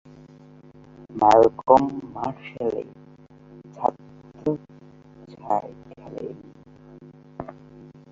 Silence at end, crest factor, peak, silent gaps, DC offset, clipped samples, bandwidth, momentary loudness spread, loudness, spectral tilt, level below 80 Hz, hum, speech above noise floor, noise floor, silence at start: 0.6 s; 24 dB; -2 dBFS; none; under 0.1%; under 0.1%; 7.8 kHz; 25 LU; -22 LUFS; -7 dB/octave; -58 dBFS; none; 29 dB; -49 dBFS; 1.1 s